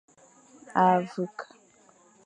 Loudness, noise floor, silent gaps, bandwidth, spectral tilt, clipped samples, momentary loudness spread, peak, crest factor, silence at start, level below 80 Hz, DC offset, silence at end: -26 LUFS; -59 dBFS; none; 9.8 kHz; -7 dB/octave; under 0.1%; 21 LU; -8 dBFS; 22 dB; 0.7 s; -80 dBFS; under 0.1%; 0.8 s